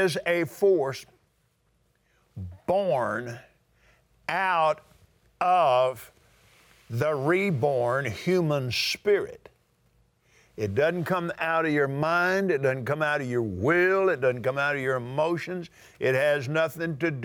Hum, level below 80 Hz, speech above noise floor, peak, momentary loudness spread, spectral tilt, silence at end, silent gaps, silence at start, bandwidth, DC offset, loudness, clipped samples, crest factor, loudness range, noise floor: none; -66 dBFS; 44 dB; -12 dBFS; 12 LU; -6 dB/octave; 0 s; none; 0 s; 20 kHz; under 0.1%; -26 LUFS; under 0.1%; 16 dB; 4 LU; -69 dBFS